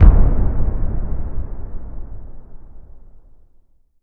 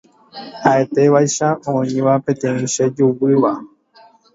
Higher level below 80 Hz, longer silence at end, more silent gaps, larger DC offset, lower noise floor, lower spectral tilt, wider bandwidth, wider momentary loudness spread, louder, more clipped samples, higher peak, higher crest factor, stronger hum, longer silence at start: first, -18 dBFS vs -60 dBFS; first, 0.85 s vs 0.7 s; neither; neither; about the same, -51 dBFS vs -49 dBFS; first, -12.5 dB/octave vs -5.5 dB/octave; second, 2.3 kHz vs 7.8 kHz; first, 21 LU vs 6 LU; second, -22 LUFS vs -16 LUFS; first, 0.3% vs under 0.1%; about the same, 0 dBFS vs 0 dBFS; about the same, 16 dB vs 16 dB; neither; second, 0 s vs 0.35 s